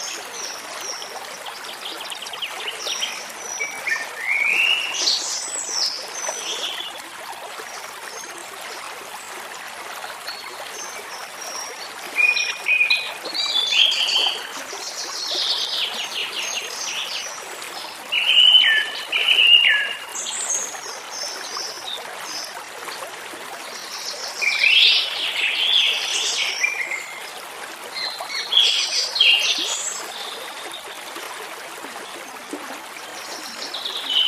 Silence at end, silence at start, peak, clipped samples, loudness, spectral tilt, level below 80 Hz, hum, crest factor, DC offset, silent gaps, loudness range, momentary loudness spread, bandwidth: 0 s; 0 s; 0 dBFS; under 0.1%; -19 LUFS; 2.5 dB/octave; -76 dBFS; none; 22 dB; under 0.1%; none; 16 LU; 18 LU; 16 kHz